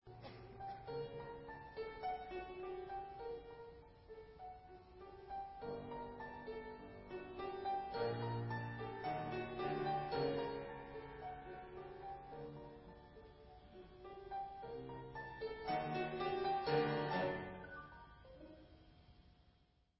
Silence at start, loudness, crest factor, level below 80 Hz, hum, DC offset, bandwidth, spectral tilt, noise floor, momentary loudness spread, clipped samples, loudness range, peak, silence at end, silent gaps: 0.05 s; -45 LUFS; 20 dB; -66 dBFS; none; under 0.1%; 5.6 kHz; -4.5 dB/octave; -74 dBFS; 19 LU; under 0.1%; 11 LU; -26 dBFS; 0.5 s; none